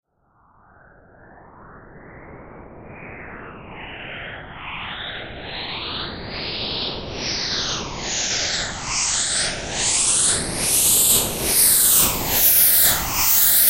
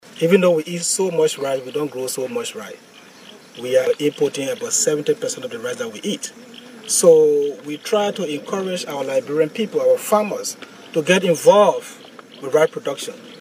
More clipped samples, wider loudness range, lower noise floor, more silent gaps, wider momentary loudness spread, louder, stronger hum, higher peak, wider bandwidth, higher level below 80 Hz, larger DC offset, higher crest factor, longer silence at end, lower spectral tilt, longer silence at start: neither; first, 21 LU vs 5 LU; first, -60 dBFS vs -43 dBFS; neither; first, 21 LU vs 16 LU; about the same, -17 LUFS vs -19 LUFS; neither; about the same, -2 dBFS vs 0 dBFS; about the same, 16.5 kHz vs 16 kHz; first, -42 dBFS vs -76 dBFS; neither; about the same, 20 dB vs 20 dB; about the same, 0 s vs 0 s; second, -0.5 dB/octave vs -3.5 dB/octave; first, 1.55 s vs 0.05 s